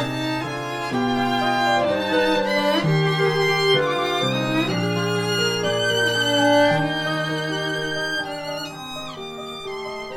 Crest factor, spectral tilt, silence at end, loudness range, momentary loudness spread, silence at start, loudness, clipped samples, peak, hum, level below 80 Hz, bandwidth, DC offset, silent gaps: 16 dB; -4.5 dB/octave; 0 s; 3 LU; 12 LU; 0 s; -21 LUFS; under 0.1%; -6 dBFS; none; -54 dBFS; 17.5 kHz; under 0.1%; none